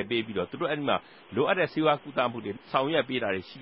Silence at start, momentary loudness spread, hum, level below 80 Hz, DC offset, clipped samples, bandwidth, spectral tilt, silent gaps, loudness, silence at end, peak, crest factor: 0 s; 6 LU; none; -64 dBFS; under 0.1%; under 0.1%; 5.8 kHz; -9.5 dB/octave; none; -28 LUFS; 0 s; -10 dBFS; 18 dB